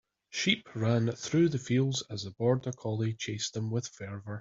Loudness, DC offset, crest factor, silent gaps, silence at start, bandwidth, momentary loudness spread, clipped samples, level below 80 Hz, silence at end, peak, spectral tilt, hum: -31 LUFS; under 0.1%; 20 dB; none; 0.3 s; 7.8 kHz; 12 LU; under 0.1%; -68 dBFS; 0 s; -12 dBFS; -5 dB/octave; none